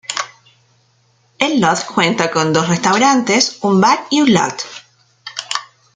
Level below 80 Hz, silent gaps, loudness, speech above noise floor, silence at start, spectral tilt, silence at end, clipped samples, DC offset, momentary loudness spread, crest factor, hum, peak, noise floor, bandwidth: -58 dBFS; none; -14 LUFS; 43 dB; 0.1 s; -4 dB/octave; 0.3 s; under 0.1%; under 0.1%; 16 LU; 16 dB; none; 0 dBFS; -57 dBFS; 9.6 kHz